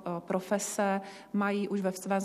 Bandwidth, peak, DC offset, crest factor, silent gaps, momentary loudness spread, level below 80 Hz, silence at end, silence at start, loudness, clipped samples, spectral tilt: 14.5 kHz; -16 dBFS; under 0.1%; 16 dB; none; 4 LU; -76 dBFS; 0 s; 0 s; -32 LUFS; under 0.1%; -5 dB/octave